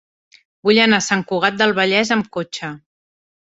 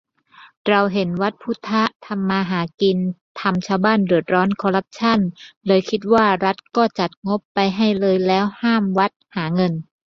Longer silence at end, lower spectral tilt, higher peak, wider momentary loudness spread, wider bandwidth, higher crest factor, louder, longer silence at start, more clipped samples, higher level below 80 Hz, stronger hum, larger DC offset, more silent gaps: first, 0.75 s vs 0.25 s; second, -3.5 dB/octave vs -7 dB/octave; about the same, -2 dBFS vs -2 dBFS; first, 13 LU vs 7 LU; first, 8 kHz vs 7.2 kHz; about the same, 18 dB vs 18 dB; first, -16 LUFS vs -19 LUFS; about the same, 0.65 s vs 0.65 s; neither; about the same, -60 dBFS vs -58 dBFS; neither; neither; second, none vs 1.96-2.00 s, 2.74-2.78 s, 3.21-3.35 s, 5.56-5.61 s, 7.17-7.22 s, 7.45-7.55 s, 9.16-9.20 s